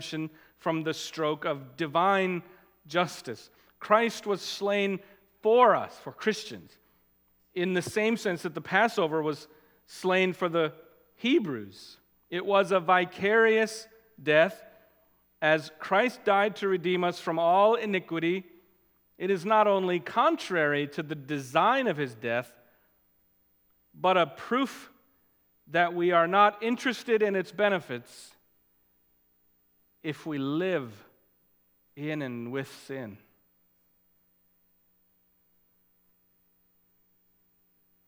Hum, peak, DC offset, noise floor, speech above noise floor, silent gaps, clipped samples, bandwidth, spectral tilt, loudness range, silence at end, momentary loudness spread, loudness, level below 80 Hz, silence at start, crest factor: none; -6 dBFS; under 0.1%; -69 dBFS; 42 dB; none; under 0.1%; 19 kHz; -5 dB/octave; 10 LU; 4.9 s; 16 LU; -27 LUFS; -78 dBFS; 0 s; 22 dB